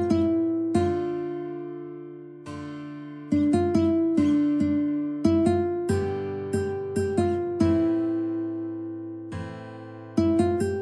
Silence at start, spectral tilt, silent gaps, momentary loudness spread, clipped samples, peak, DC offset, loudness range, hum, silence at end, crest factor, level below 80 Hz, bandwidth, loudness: 0 s; -8 dB/octave; none; 16 LU; under 0.1%; -8 dBFS; under 0.1%; 4 LU; none; 0 s; 16 dB; -54 dBFS; 10.5 kHz; -25 LUFS